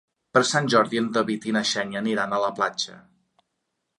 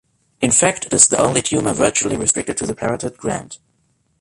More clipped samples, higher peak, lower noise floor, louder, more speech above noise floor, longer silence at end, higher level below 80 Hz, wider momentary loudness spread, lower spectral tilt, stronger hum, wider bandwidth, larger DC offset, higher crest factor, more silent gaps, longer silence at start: neither; second, -4 dBFS vs 0 dBFS; first, -79 dBFS vs -63 dBFS; second, -23 LUFS vs -16 LUFS; first, 55 dB vs 46 dB; first, 1 s vs 0.65 s; second, -70 dBFS vs -46 dBFS; second, 6 LU vs 12 LU; about the same, -3.5 dB/octave vs -3 dB/octave; neither; about the same, 11 kHz vs 11.5 kHz; neither; about the same, 22 dB vs 18 dB; neither; about the same, 0.35 s vs 0.4 s